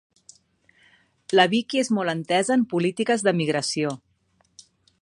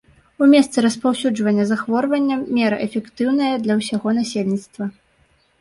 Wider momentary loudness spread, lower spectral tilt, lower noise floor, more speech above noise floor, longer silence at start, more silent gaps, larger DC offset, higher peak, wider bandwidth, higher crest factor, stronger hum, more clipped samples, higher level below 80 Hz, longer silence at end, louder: second, 6 LU vs 10 LU; about the same, -4.5 dB/octave vs -5.5 dB/octave; first, -66 dBFS vs -59 dBFS; about the same, 44 dB vs 41 dB; first, 1.3 s vs 0.4 s; neither; neither; about the same, -2 dBFS vs -4 dBFS; about the same, 11.5 kHz vs 11.5 kHz; first, 22 dB vs 16 dB; neither; neither; second, -72 dBFS vs -62 dBFS; first, 1.05 s vs 0.7 s; second, -22 LUFS vs -19 LUFS